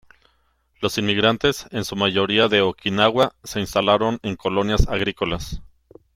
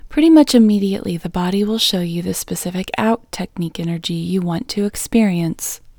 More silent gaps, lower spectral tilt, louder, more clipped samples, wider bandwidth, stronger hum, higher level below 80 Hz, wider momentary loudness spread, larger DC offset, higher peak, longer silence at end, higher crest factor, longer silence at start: neither; about the same, -4.5 dB/octave vs -5 dB/octave; second, -20 LUFS vs -17 LUFS; neither; second, 16 kHz vs over 20 kHz; neither; first, -34 dBFS vs -44 dBFS; about the same, 10 LU vs 12 LU; neither; about the same, -2 dBFS vs 0 dBFS; first, 0.5 s vs 0.2 s; about the same, 18 dB vs 16 dB; first, 0.8 s vs 0.05 s